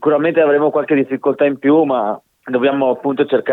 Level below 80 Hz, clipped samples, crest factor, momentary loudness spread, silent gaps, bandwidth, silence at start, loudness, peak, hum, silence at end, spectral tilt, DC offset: -68 dBFS; under 0.1%; 12 dB; 6 LU; none; 4.1 kHz; 0 s; -15 LUFS; -2 dBFS; none; 0 s; -8.5 dB/octave; under 0.1%